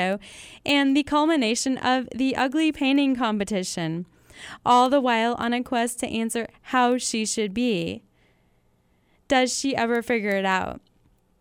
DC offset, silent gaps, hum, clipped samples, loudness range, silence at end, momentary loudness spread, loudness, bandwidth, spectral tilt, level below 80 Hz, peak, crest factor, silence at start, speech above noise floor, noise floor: under 0.1%; none; none; under 0.1%; 4 LU; 0.65 s; 12 LU; -23 LUFS; 16 kHz; -3.5 dB/octave; -56 dBFS; -6 dBFS; 18 dB; 0 s; 41 dB; -64 dBFS